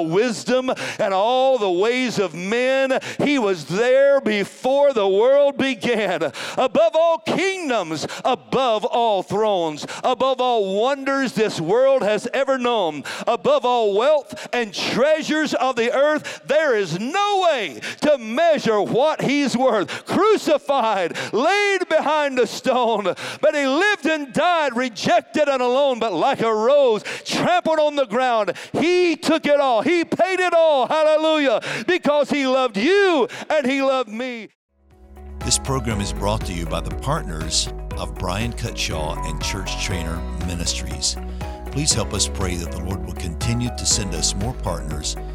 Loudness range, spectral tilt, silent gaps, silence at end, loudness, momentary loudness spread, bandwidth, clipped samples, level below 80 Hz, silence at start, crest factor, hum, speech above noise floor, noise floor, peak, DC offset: 6 LU; -4 dB/octave; 34.55-34.69 s; 0 s; -20 LUFS; 9 LU; 15.5 kHz; under 0.1%; -36 dBFS; 0 s; 16 dB; none; 27 dB; -46 dBFS; -2 dBFS; under 0.1%